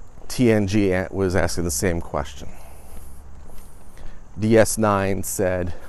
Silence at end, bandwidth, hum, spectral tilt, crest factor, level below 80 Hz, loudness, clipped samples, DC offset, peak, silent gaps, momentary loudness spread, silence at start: 0 s; 13.5 kHz; none; -5.5 dB/octave; 18 dB; -38 dBFS; -21 LUFS; under 0.1%; under 0.1%; -4 dBFS; none; 16 LU; 0 s